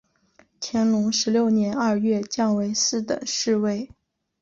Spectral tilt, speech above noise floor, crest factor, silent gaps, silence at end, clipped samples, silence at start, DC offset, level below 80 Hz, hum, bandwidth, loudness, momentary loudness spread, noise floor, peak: -4 dB/octave; 38 dB; 12 dB; none; 0.55 s; under 0.1%; 0.6 s; under 0.1%; -62 dBFS; none; 7.6 kHz; -23 LUFS; 7 LU; -60 dBFS; -10 dBFS